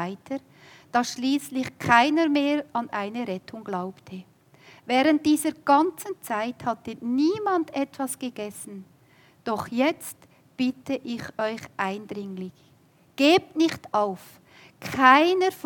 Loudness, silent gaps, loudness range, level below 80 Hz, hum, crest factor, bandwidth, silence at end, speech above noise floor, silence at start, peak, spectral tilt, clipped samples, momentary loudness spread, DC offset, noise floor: -24 LUFS; none; 6 LU; -70 dBFS; none; 24 dB; 18 kHz; 0.05 s; 34 dB; 0 s; -2 dBFS; -4 dB/octave; under 0.1%; 17 LU; under 0.1%; -59 dBFS